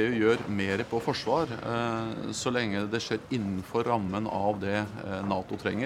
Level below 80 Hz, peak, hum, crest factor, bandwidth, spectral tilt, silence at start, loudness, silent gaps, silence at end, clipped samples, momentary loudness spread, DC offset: -60 dBFS; -12 dBFS; none; 18 dB; 14.5 kHz; -5.5 dB/octave; 0 s; -30 LUFS; none; 0 s; under 0.1%; 4 LU; under 0.1%